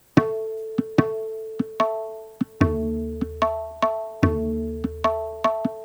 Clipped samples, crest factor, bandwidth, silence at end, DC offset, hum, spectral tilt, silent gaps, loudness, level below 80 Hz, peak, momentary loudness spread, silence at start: under 0.1%; 24 dB; over 20 kHz; 0 s; under 0.1%; none; -7.5 dB/octave; none; -25 LUFS; -40 dBFS; 0 dBFS; 8 LU; 0.15 s